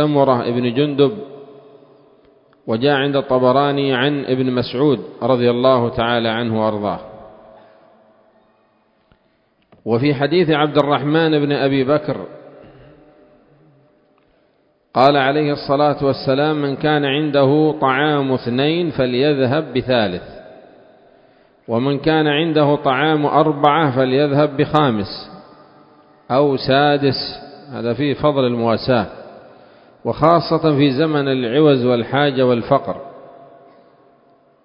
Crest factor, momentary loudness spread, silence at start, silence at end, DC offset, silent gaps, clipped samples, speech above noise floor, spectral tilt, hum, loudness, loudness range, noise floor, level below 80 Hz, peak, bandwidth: 18 dB; 10 LU; 0 s; 1.35 s; under 0.1%; none; under 0.1%; 44 dB; -9 dB/octave; none; -16 LUFS; 5 LU; -60 dBFS; -52 dBFS; 0 dBFS; 5.4 kHz